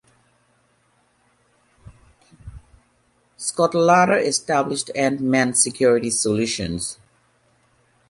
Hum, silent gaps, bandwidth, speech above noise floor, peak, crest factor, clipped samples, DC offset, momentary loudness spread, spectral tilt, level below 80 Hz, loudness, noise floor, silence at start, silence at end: none; none; 11.5 kHz; 44 dB; -4 dBFS; 20 dB; under 0.1%; under 0.1%; 12 LU; -3.5 dB/octave; -52 dBFS; -19 LUFS; -63 dBFS; 2.45 s; 1.15 s